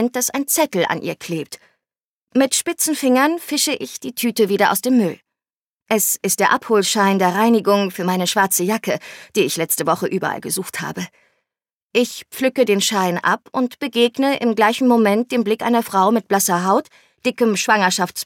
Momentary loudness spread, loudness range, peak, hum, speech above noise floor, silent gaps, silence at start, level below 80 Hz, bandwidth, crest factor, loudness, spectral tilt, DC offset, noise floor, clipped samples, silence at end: 9 LU; 4 LU; -2 dBFS; none; over 72 dB; 2.05-2.27 s, 5.57-5.86 s, 11.72-11.90 s; 0 s; -70 dBFS; 17.5 kHz; 16 dB; -18 LUFS; -3.5 dB/octave; under 0.1%; under -90 dBFS; under 0.1%; 0 s